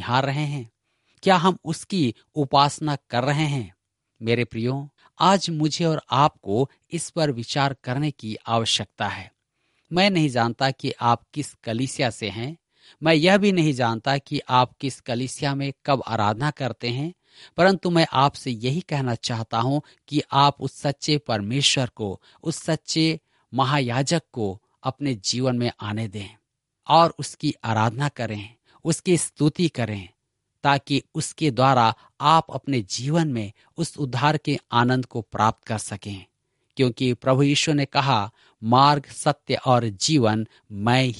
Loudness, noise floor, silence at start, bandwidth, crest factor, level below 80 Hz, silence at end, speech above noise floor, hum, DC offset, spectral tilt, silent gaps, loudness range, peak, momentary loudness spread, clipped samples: -23 LUFS; -71 dBFS; 0 s; 11.5 kHz; 22 dB; -60 dBFS; 0 s; 49 dB; none; under 0.1%; -5 dB/octave; none; 3 LU; -2 dBFS; 12 LU; under 0.1%